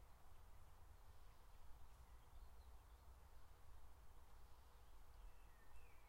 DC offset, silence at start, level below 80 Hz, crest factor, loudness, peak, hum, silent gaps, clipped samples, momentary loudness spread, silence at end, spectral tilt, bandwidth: under 0.1%; 0 s; -64 dBFS; 14 dB; -69 LUFS; -46 dBFS; none; none; under 0.1%; 2 LU; 0 s; -4.5 dB/octave; 16 kHz